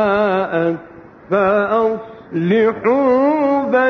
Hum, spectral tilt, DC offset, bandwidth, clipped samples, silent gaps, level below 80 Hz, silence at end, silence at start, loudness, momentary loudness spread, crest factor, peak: none; -8.5 dB/octave; under 0.1%; 6.4 kHz; under 0.1%; none; -54 dBFS; 0 s; 0 s; -16 LUFS; 8 LU; 12 dB; -4 dBFS